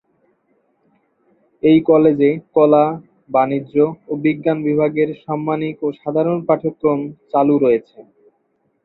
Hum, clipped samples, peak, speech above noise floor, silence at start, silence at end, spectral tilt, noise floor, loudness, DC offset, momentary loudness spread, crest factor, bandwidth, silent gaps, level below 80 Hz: none; under 0.1%; -2 dBFS; 49 dB; 1.65 s; 0.85 s; -11.5 dB/octave; -65 dBFS; -17 LUFS; under 0.1%; 9 LU; 16 dB; 4.2 kHz; none; -60 dBFS